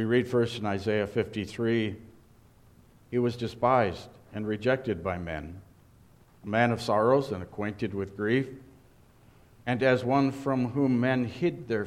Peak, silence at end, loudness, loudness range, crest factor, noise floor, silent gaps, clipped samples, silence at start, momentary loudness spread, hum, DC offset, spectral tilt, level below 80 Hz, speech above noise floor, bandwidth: -8 dBFS; 0 s; -28 LUFS; 2 LU; 20 dB; -57 dBFS; none; under 0.1%; 0 s; 12 LU; none; under 0.1%; -7 dB/octave; -58 dBFS; 30 dB; 13 kHz